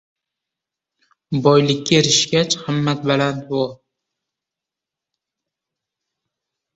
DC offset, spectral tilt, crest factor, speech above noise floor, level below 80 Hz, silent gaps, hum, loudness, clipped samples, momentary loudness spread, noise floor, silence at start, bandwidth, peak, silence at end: under 0.1%; -4 dB/octave; 20 dB; 69 dB; -58 dBFS; none; none; -17 LUFS; under 0.1%; 9 LU; -86 dBFS; 1.3 s; 8.2 kHz; -2 dBFS; 3 s